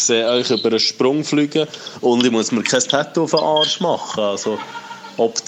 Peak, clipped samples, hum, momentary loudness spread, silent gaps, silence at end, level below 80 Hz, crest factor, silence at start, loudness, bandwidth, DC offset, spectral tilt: -2 dBFS; under 0.1%; none; 9 LU; none; 0 s; -66 dBFS; 16 dB; 0 s; -17 LUFS; 9.8 kHz; under 0.1%; -3 dB/octave